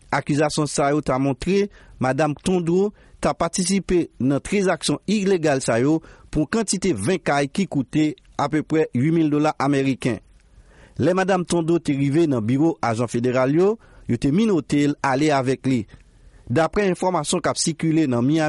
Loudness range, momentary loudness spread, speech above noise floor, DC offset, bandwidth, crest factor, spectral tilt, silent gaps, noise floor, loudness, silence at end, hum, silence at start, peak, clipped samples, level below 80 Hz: 2 LU; 5 LU; 30 dB; under 0.1%; 11.5 kHz; 14 dB; -5.5 dB/octave; none; -50 dBFS; -21 LUFS; 0 s; none; 0.1 s; -6 dBFS; under 0.1%; -46 dBFS